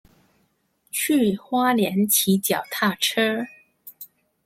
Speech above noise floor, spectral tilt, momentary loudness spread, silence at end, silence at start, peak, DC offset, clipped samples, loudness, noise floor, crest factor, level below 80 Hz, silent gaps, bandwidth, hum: 47 dB; -3.5 dB/octave; 21 LU; 0.4 s; 0.95 s; -4 dBFS; under 0.1%; under 0.1%; -21 LUFS; -68 dBFS; 20 dB; -66 dBFS; none; 16.5 kHz; none